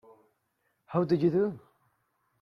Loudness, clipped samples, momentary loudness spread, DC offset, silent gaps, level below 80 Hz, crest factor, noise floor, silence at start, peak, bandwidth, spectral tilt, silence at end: -28 LUFS; under 0.1%; 9 LU; under 0.1%; none; -70 dBFS; 18 dB; -77 dBFS; 0.9 s; -14 dBFS; 6 kHz; -10 dB/octave; 0.85 s